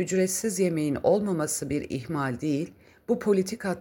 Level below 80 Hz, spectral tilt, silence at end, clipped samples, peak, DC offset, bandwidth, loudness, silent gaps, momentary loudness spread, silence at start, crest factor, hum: -58 dBFS; -5.5 dB/octave; 0 s; under 0.1%; -10 dBFS; under 0.1%; 17 kHz; -27 LUFS; none; 7 LU; 0 s; 16 dB; none